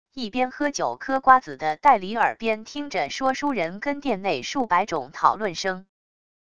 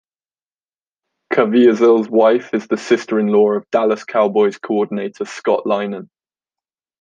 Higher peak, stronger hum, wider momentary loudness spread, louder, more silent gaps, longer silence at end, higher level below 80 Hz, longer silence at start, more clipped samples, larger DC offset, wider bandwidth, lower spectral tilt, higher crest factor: about the same, -2 dBFS vs -2 dBFS; neither; about the same, 10 LU vs 10 LU; second, -23 LUFS vs -16 LUFS; neither; second, 0.7 s vs 0.95 s; first, -58 dBFS vs -68 dBFS; second, 0.05 s vs 1.3 s; neither; first, 0.5% vs under 0.1%; first, 10 kHz vs 9 kHz; second, -3.5 dB/octave vs -6 dB/octave; first, 22 dB vs 14 dB